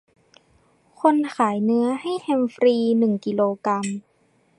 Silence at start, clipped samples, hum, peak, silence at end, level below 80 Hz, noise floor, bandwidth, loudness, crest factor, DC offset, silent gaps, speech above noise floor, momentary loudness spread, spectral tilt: 1.05 s; under 0.1%; none; -4 dBFS; 0.6 s; -70 dBFS; -62 dBFS; 11 kHz; -21 LUFS; 18 dB; under 0.1%; none; 42 dB; 6 LU; -6.5 dB/octave